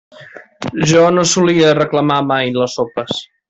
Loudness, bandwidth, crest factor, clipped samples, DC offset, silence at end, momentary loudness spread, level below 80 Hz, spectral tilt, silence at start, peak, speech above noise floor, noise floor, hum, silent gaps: -13 LUFS; 8.4 kHz; 12 dB; under 0.1%; under 0.1%; 0.25 s; 11 LU; -52 dBFS; -4.5 dB/octave; 0.2 s; -2 dBFS; 25 dB; -38 dBFS; none; none